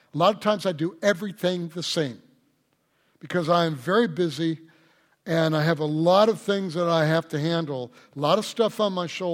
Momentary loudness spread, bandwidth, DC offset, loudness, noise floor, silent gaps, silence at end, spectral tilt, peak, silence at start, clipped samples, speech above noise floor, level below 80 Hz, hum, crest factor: 8 LU; 16.5 kHz; under 0.1%; -24 LUFS; -69 dBFS; none; 0 s; -5.5 dB/octave; -6 dBFS; 0.15 s; under 0.1%; 45 dB; -70 dBFS; none; 18 dB